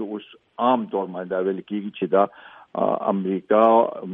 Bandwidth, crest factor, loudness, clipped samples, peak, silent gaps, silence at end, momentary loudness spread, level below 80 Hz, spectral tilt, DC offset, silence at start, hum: 3.8 kHz; 20 dB; -22 LUFS; under 0.1%; -4 dBFS; none; 0 s; 14 LU; -74 dBFS; -10 dB/octave; under 0.1%; 0 s; none